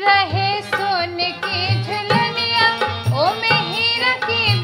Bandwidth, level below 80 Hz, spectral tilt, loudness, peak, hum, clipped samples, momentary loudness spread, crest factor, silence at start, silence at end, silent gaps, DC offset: 16 kHz; -54 dBFS; -5 dB/octave; -17 LUFS; -2 dBFS; none; under 0.1%; 5 LU; 18 dB; 0 s; 0 s; none; under 0.1%